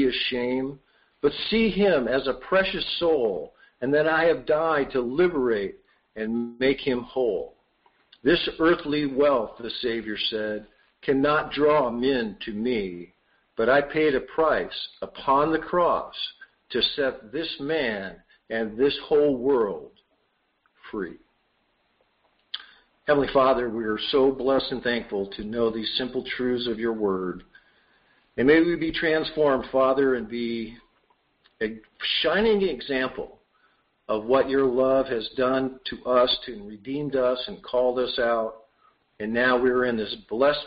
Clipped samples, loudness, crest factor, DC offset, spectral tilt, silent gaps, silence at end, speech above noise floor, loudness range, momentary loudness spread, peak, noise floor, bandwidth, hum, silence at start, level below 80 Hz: under 0.1%; -24 LUFS; 18 dB; under 0.1%; -2.5 dB/octave; none; 0 s; 47 dB; 4 LU; 13 LU; -8 dBFS; -71 dBFS; 5.4 kHz; none; 0 s; -52 dBFS